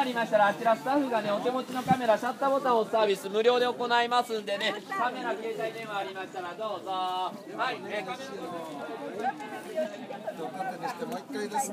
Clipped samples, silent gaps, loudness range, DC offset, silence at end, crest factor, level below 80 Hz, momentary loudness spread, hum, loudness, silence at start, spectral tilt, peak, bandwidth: under 0.1%; none; 9 LU; under 0.1%; 0 s; 20 dB; -78 dBFS; 12 LU; none; -30 LUFS; 0 s; -4 dB/octave; -10 dBFS; 15.5 kHz